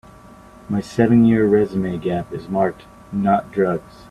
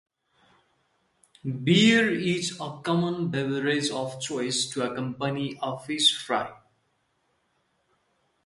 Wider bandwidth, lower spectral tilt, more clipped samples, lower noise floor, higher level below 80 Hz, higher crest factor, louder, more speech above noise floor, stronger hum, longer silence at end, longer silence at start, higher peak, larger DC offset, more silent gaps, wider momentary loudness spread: about the same, 11 kHz vs 11.5 kHz; first, -8.5 dB/octave vs -4 dB/octave; neither; second, -43 dBFS vs -72 dBFS; first, -48 dBFS vs -68 dBFS; about the same, 16 dB vs 20 dB; first, -19 LUFS vs -25 LUFS; second, 25 dB vs 46 dB; neither; second, 0.3 s vs 1.9 s; second, 0.7 s vs 1.45 s; first, -2 dBFS vs -8 dBFS; neither; neither; about the same, 12 LU vs 12 LU